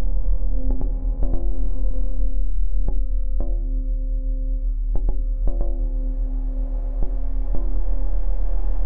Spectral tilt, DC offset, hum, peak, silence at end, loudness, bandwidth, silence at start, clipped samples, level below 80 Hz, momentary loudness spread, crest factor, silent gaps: -12.5 dB/octave; under 0.1%; none; -6 dBFS; 0 s; -28 LUFS; 1.3 kHz; 0 s; under 0.1%; -22 dBFS; 2 LU; 10 dB; none